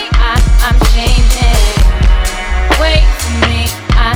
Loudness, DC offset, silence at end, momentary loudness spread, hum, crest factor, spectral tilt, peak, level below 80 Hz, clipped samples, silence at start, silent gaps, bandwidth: -12 LUFS; under 0.1%; 0 s; 4 LU; none; 8 dB; -4.5 dB/octave; 0 dBFS; -10 dBFS; under 0.1%; 0 s; none; 16 kHz